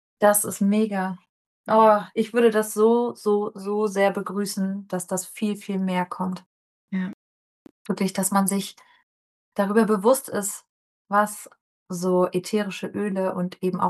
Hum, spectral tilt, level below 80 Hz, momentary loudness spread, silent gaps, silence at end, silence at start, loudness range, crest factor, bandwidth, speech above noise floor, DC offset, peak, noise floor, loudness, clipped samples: none; -5 dB/octave; -76 dBFS; 12 LU; 1.29-1.64 s, 6.46-6.88 s, 7.14-7.65 s, 7.71-7.85 s, 9.03-9.52 s, 10.69-11.05 s, 11.61-11.86 s; 0 s; 0.2 s; 7 LU; 18 dB; 13 kHz; over 67 dB; under 0.1%; -4 dBFS; under -90 dBFS; -23 LUFS; under 0.1%